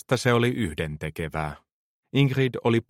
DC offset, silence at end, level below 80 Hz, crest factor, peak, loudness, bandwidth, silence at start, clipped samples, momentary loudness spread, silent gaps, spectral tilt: under 0.1%; 0.05 s; -48 dBFS; 18 dB; -6 dBFS; -25 LUFS; 16 kHz; 0.1 s; under 0.1%; 10 LU; 1.72-2.03 s; -6.5 dB/octave